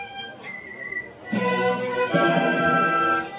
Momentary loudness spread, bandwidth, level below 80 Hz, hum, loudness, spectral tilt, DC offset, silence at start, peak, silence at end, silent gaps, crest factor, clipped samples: 15 LU; 4 kHz; -60 dBFS; none; -22 LUFS; -9 dB/octave; under 0.1%; 0 s; -8 dBFS; 0 s; none; 16 dB; under 0.1%